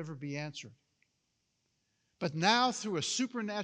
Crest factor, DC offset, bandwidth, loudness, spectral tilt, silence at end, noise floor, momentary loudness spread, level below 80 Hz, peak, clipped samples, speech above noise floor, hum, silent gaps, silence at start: 24 dB; under 0.1%; 10.5 kHz; -32 LUFS; -3.5 dB/octave; 0 s; -80 dBFS; 13 LU; -86 dBFS; -12 dBFS; under 0.1%; 47 dB; none; none; 0 s